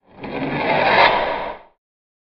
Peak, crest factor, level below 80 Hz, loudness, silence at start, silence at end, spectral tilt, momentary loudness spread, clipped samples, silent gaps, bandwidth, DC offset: 0 dBFS; 20 dB; -46 dBFS; -17 LUFS; 0.15 s; 0.65 s; -1.5 dB/octave; 18 LU; under 0.1%; none; 6.4 kHz; under 0.1%